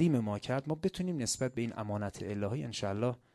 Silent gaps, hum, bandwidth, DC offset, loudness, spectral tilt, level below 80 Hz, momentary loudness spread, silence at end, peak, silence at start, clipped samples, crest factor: none; none; 13.5 kHz; under 0.1%; -35 LUFS; -5.5 dB/octave; -60 dBFS; 4 LU; 0.2 s; -18 dBFS; 0 s; under 0.1%; 16 dB